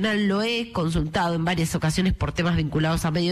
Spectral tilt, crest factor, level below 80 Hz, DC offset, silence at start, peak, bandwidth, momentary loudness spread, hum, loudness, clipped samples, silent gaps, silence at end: -5.5 dB/octave; 10 dB; -38 dBFS; under 0.1%; 0 s; -14 dBFS; 13.5 kHz; 2 LU; none; -24 LUFS; under 0.1%; none; 0 s